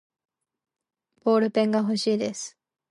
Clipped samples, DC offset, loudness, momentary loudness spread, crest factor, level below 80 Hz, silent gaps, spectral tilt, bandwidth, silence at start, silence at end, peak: under 0.1%; under 0.1%; -24 LUFS; 12 LU; 16 dB; -76 dBFS; none; -5 dB/octave; 11.5 kHz; 1.25 s; 0.4 s; -10 dBFS